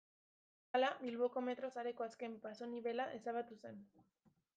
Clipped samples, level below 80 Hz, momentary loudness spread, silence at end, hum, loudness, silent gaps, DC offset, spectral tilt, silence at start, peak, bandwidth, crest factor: under 0.1%; under -90 dBFS; 13 LU; 0.55 s; none; -43 LUFS; none; under 0.1%; -5 dB/octave; 0.75 s; -24 dBFS; 7.8 kHz; 20 dB